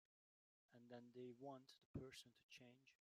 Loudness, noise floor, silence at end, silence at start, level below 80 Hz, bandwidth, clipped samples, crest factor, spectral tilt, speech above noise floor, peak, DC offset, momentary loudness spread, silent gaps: -61 LUFS; under -90 dBFS; 0.05 s; 0.7 s; -80 dBFS; 15 kHz; under 0.1%; 22 dB; -5.5 dB/octave; over 29 dB; -42 dBFS; under 0.1%; 8 LU; 1.85-1.94 s, 2.43-2.49 s